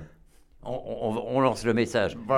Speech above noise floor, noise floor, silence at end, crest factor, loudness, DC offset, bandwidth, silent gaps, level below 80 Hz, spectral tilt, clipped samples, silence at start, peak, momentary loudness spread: 29 dB; -55 dBFS; 0 s; 18 dB; -27 LUFS; under 0.1%; 16 kHz; none; -52 dBFS; -6 dB/octave; under 0.1%; 0 s; -8 dBFS; 12 LU